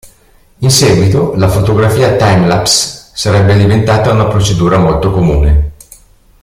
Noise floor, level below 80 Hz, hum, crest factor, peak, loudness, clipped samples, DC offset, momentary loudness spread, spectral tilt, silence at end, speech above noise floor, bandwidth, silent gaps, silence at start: -45 dBFS; -22 dBFS; none; 10 dB; 0 dBFS; -9 LUFS; under 0.1%; under 0.1%; 4 LU; -5 dB/octave; 0.7 s; 37 dB; 16 kHz; none; 0.05 s